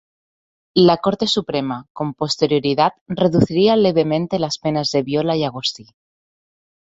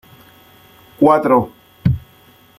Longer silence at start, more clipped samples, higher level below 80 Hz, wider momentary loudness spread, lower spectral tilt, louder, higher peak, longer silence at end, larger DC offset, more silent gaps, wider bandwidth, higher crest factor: second, 0.75 s vs 1 s; neither; second, -54 dBFS vs -42 dBFS; second, 9 LU vs 12 LU; second, -6 dB/octave vs -9 dB/octave; about the same, -18 LUFS vs -16 LUFS; about the same, -2 dBFS vs -2 dBFS; first, 1.05 s vs 0.6 s; neither; first, 1.90-1.95 s, 3.01-3.06 s vs none; second, 8 kHz vs 15.5 kHz; about the same, 18 dB vs 16 dB